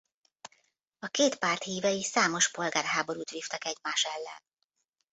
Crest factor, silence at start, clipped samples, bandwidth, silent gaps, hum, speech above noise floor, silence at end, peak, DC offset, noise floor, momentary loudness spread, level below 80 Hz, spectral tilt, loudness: 22 dB; 0.45 s; under 0.1%; 8.2 kHz; none; none; 49 dB; 0.75 s; -12 dBFS; under 0.1%; -79 dBFS; 10 LU; -76 dBFS; -1.5 dB/octave; -29 LUFS